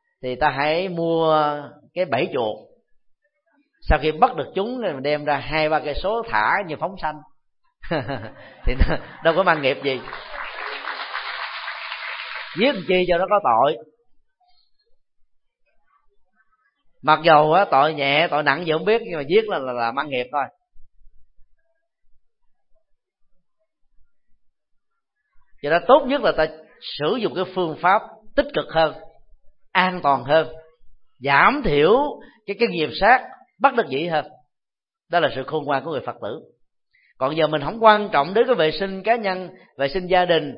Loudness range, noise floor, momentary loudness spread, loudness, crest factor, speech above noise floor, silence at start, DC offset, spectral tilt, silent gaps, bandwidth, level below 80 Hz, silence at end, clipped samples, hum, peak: 7 LU; -88 dBFS; 14 LU; -21 LUFS; 22 dB; 68 dB; 0.25 s; under 0.1%; -10 dB/octave; none; 5.6 kHz; -38 dBFS; 0 s; under 0.1%; none; 0 dBFS